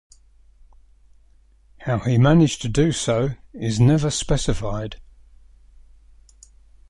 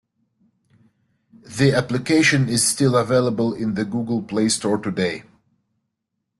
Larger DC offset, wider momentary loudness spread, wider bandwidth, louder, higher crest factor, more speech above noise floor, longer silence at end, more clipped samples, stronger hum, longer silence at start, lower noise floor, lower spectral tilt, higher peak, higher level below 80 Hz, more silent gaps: neither; first, 14 LU vs 8 LU; about the same, 11.5 kHz vs 12.5 kHz; about the same, -20 LUFS vs -20 LUFS; about the same, 18 dB vs 18 dB; second, 35 dB vs 59 dB; first, 1.9 s vs 1.2 s; neither; neither; first, 1.8 s vs 1.45 s; second, -54 dBFS vs -78 dBFS; first, -6 dB/octave vs -4.5 dB/octave; about the same, -4 dBFS vs -4 dBFS; first, -38 dBFS vs -56 dBFS; neither